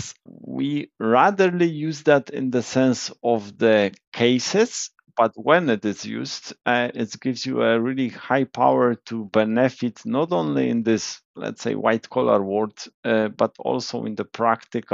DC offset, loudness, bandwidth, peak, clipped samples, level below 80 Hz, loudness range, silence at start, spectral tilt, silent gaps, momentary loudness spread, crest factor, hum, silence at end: under 0.1%; -22 LUFS; 8 kHz; -4 dBFS; under 0.1%; -72 dBFS; 2 LU; 0 s; -4 dB/octave; 4.07-4.12 s, 11.25-11.34 s, 12.94-13.03 s; 11 LU; 18 dB; none; 0 s